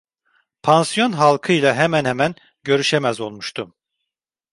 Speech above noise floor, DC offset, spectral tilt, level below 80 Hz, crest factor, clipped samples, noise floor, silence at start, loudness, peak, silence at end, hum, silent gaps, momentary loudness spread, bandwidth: 66 dB; under 0.1%; -4.5 dB/octave; -60 dBFS; 18 dB; under 0.1%; -83 dBFS; 0.65 s; -18 LUFS; -2 dBFS; 0.85 s; none; none; 13 LU; 11.5 kHz